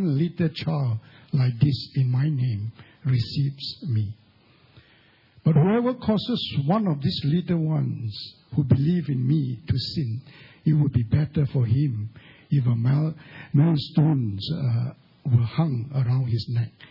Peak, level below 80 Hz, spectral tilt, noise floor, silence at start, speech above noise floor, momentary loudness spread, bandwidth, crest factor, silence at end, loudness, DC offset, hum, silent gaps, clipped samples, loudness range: -6 dBFS; -56 dBFS; -9.5 dB/octave; -57 dBFS; 0 s; 34 dB; 9 LU; 5.8 kHz; 18 dB; 0.05 s; -24 LUFS; under 0.1%; none; none; under 0.1%; 2 LU